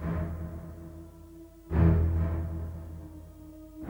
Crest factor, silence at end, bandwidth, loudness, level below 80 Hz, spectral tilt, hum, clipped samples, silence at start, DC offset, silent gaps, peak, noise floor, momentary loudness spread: 18 dB; 0 s; 16.5 kHz; -30 LUFS; -38 dBFS; -10 dB/octave; none; under 0.1%; 0 s; under 0.1%; none; -12 dBFS; -49 dBFS; 24 LU